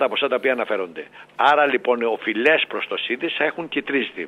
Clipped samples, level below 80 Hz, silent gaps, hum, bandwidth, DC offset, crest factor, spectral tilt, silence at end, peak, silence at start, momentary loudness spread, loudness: under 0.1%; -70 dBFS; none; none; 10.5 kHz; under 0.1%; 18 dB; -5 dB/octave; 0 s; -4 dBFS; 0 s; 9 LU; -20 LUFS